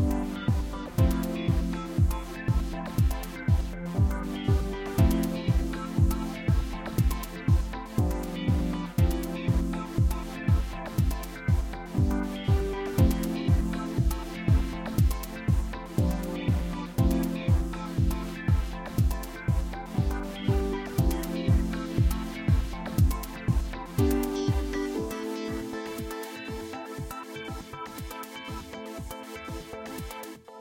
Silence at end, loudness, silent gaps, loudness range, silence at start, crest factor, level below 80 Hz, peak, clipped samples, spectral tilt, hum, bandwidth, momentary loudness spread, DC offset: 0 s; -29 LUFS; none; 7 LU; 0 s; 18 dB; -32 dBFS; -10 dBFS; under 0.1%; -7 dB/octave; none; 17 kHz; 11 LU; under 0.1%